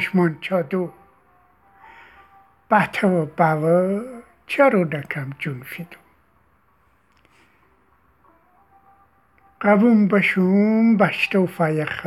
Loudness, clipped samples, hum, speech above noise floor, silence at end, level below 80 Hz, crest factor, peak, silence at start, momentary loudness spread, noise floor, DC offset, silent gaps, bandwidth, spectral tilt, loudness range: -19 LUFS; under 0.1%; none; 42 dB; 0 s; -64 dBFS; 18 dB; -2 dBFS; 0 s; 14 LU; -61 dBFS; under 0.1%; none; 14 kHz; -7.5 dB/octave; 13 LU